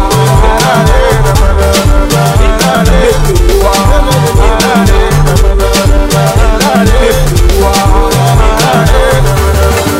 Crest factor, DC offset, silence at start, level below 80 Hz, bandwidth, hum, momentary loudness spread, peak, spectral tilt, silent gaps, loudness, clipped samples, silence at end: 6 dB; 0.9%; 0 s; -10 dBFS; 16.5 kHz; none; 1 LU; 0 dBFS; -5 dB/octave; none; -8 LUFS; 2%; 0 s